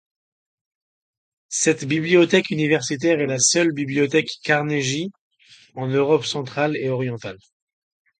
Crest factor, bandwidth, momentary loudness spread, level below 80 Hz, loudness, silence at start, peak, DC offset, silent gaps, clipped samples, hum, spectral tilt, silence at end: 20 dB; 9.4 kHz; 11 LU; -66 dBFS; -20 LUFS; 1.5 s; -2 dBFS; under 0.1%; 5.19-5.31 s; under 0.1%; none; -4 dB/octave; 0.85 s